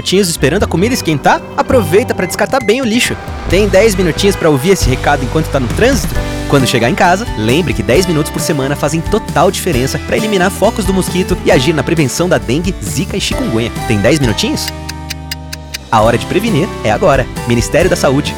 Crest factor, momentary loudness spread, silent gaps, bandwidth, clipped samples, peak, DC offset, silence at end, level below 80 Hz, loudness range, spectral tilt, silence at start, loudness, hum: 10 dB; 6 LU; none; 20 kHz; under 0.1%; 0 dBFS; under 0.1%; 0 s; -26 dBFS; 3 LU; -5 dB/octave; 0 s; -12 LUFS; none